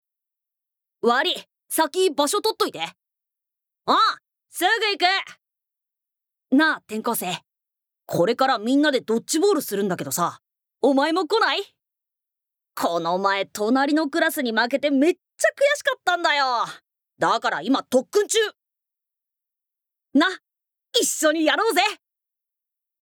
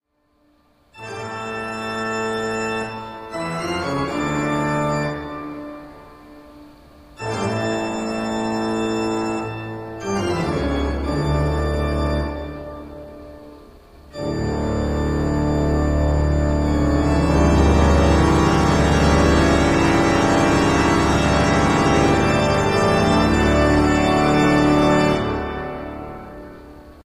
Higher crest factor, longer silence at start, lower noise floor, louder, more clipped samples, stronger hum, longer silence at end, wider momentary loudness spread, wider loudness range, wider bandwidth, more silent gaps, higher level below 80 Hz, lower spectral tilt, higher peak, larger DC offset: about the same, 20 dB vs 16 dB; about the same, 1.05 s vs 0.95 s; first, -84 dBFS vs -62 dBFS; second, -22 LUFS vs -19 LUFS; neither; neither; first, 1.1 s vs 0.05 s; second, 8 LU vs 16 LU; second, 3 LU vs 10 LU; first, over 20 kHz vs 12.5 kHz; neither; second, -80 dBFS vs -28 dBFS; second, -2.5 dB/octave vs -6 dB/octave; about the same, -4 dBFS vs -4 dBFS; neither